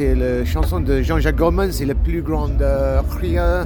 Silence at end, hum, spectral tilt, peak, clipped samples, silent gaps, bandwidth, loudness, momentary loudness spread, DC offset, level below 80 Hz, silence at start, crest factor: 0 s; none; -7.5 dB/octave; -4 dBFS; under 0.1%; none; 19 kHz; -19 LUFS; 4 LU; under 0.1%; -20 dBFS; 0 s; 14 dB